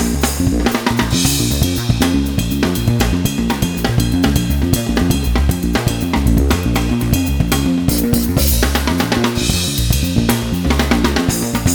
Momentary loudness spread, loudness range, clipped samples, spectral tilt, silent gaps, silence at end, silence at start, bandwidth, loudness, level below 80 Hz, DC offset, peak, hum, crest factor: 3 LU; 1 LU; under 0.1%; -5 dB/octave; none; 0 s; 0 s; over 20 kHz; -16 LUFS; -22 dBFS; 0.1%; 0 dBFS; none; 14 dB